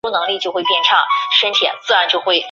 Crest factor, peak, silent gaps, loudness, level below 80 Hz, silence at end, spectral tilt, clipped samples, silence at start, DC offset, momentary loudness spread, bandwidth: 16 dB; 0 dBFS; none; -14 LUFS; -66 dBFS; 0 s; -1 dB/octave; under 0.1%; 0.05 s; under 0.1%; 6 LU; 7.6 kHz